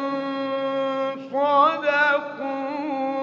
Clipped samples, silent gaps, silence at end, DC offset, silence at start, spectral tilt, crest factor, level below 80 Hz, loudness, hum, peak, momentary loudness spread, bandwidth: under 0.1%; none; 0 s; under 0.1%; 0 s; -5 dB/octave; 18 dB; -78 dBFS; -23 LUFS; none; -6 dBFS; 10 LU; 7 kHz